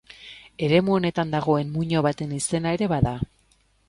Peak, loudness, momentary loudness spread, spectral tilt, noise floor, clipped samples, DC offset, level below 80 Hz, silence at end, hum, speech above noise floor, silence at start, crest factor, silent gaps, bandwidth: -6 dBFS; -24 LUFS; 14 LU; -6 dB/octave; -63 dBFS; under 0.1%; under 0.1%; -46 dBFS; 0.65 s; none; 40 dB; 0.1 s; 18 dB; none; 11.5 kHz